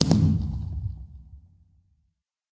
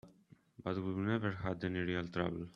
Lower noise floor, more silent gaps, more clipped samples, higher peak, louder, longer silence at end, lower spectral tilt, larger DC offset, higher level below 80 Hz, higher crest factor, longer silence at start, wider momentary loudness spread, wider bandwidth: first, -75 dBFS vs -65 dBFS; neither; neither; first, -4 dBFS vs -18 dBFS; first, -26 LUFS vs -38 LUFS; first, 1.15 s vs 0.05 s; second, -6.5 dB/octave vs -8 dB/octave; neither; first, -36 dBFS vs -66 dBFS; about the same, 24 dB vs 20 dB; about the same, 0 s vs 0.05 s; first, 24 LU vs 4 LU; first, 8 kHz vs 7 kHz